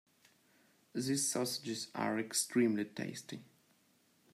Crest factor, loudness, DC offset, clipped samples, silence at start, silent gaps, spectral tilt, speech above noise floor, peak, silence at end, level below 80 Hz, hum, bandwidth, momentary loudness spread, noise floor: 18 dB; -36 LUFS; under 0.1%; under 0.1%; 0.95 s; none; -3.5 dB/octave; 36 dB; -20 dBFS; 0.9 s; -84 dBFS; none; 16 kHz; 14 LU; -72 dBFS